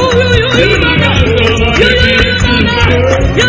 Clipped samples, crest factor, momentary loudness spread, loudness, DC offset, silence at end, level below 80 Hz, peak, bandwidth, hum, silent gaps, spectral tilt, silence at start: 1%; 8 dB; 2 LU; -8 LUFS; under 0.1%; 0 s; -18 dBFS; 0 dBFS; 8 kHz; none; none; -5 dB/octave; 0 s